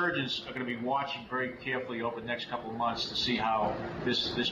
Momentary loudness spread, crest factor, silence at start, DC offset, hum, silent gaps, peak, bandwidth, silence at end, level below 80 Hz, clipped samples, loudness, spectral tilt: 6 LU; 16 dB; 0 s; under 0.1%; none; none; -16 dBFS; 13 kHz; 0 s; -60 dBFS; under 0.1%; -32 LUFS; -4.5 dB/octave